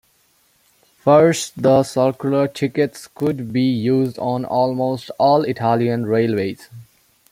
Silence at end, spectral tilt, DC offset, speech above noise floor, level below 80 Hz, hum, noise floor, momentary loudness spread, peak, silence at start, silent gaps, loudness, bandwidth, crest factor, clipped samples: 0.5 s; -6.5 dB/octave; under 0.1%; 42 dB; -60 dBFS; none; -59 dBFS; 8 LU; -2 dBFS; 1.05 s; none; -18 LUFS; 16 kHz; 18 dB; under 0.1%